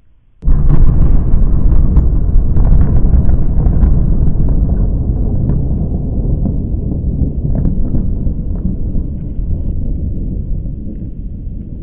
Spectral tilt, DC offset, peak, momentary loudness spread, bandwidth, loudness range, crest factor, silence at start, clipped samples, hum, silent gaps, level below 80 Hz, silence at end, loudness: -14 dB/octave; under 0.1%; 0 dBFS; 10 LU; 1.9 kHz; 7 LU; 10 dB; 0.4 s; under 0.1%; none; none; -12 dBFS; 0 s; -16 LUFS